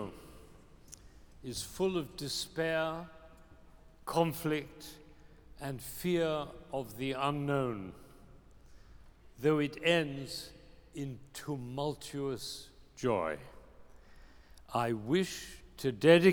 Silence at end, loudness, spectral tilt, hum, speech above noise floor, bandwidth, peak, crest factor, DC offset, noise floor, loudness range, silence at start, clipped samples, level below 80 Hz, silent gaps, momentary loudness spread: 0 s; -34 LUFS; -5 dB/octave; none; 24 dB; over 20 kHz; -10 dBFS; 26 dB; under 0.1%; -57 dBFS; 4 LU; 0 s; under 0.1%; -60 dBFS; none; 19 LU